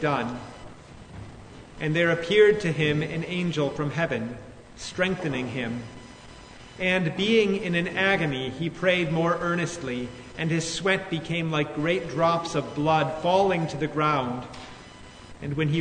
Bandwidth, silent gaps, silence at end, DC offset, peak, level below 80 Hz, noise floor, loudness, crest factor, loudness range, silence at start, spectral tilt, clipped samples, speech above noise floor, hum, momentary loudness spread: 9.6 kHz; none; 0 s; under 0.1%; -6 dBFS; -52 dBFS; -45 dBFS; -25 LUFS; 20 dB; 5 LU; 0 s; -5.5 dB/octave; under 0.1%; 20 dB; none; 22 LU